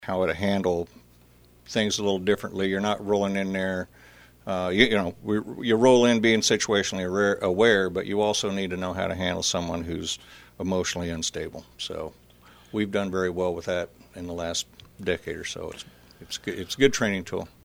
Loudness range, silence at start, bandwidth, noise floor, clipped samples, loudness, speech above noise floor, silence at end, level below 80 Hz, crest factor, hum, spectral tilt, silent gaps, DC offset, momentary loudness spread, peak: 9 LU; 0 s; over 20 kHz; -55 dBFS; under 0.1%; -25 LUFS; 30 dB; 0.15 s; -52 dBFS; 24 dB; none; -4 dB/octave; none; under 0.1%; 15 LU; -2 dBFS